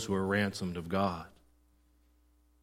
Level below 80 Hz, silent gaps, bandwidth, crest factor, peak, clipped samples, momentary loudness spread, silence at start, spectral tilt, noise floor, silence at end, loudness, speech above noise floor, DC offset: -62 dBFS; none; 15.5 kHz; 18 dB; -18 dBFS; under 0.1%; 12 LU; 0 s; -5.5 dB/octave; -67 dBFS; 1.35 s; -33 LUFS; 35 dB; under 0.1%